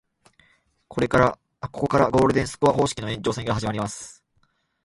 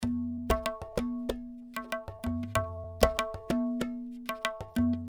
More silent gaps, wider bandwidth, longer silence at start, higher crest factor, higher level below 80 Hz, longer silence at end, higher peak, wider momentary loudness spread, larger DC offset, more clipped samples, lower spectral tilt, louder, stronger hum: neither; second, 11.5 kHz vs over 20 kHz; first, 0.9 s vs 0 s; second, 20 dB vs 28 dB; about the same, -46 dBFS vs -44 dBFS; first, 0.75 s vs 0 s; about the same, -4 dBFS vs -4 dBFS; first, 16 LU vs 10 LU; neither; neither; about the same, -5.5 dB/octave vs -5.5 dB/octave; first, -23 LUFS vs -33 LUFS; neither